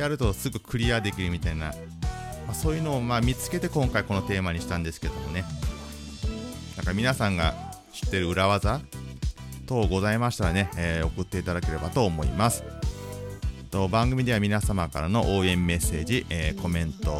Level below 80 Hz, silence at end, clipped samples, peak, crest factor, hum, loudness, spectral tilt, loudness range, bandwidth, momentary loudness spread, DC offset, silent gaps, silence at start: -36 dBFS; 0 s; under 0.1%; -6 dBFS; 20 dB; none; -27 LUFS; -5.5 dB/octave; 4 LU; 16 kHz; 11 LU; under 0.1%; none; 0 s